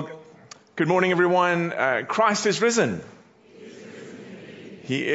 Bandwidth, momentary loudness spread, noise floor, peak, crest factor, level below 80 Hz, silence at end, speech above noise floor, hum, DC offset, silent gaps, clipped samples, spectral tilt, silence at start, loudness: 8 kHz; 22 LU; -49 dBFS; -6 dBFS; 18 dB; -70 dBFS; 0 s; 28 dB; none; under 0.1%; none; under 0.1%; -4.5 dB/octave; 0 s; -22 LUFS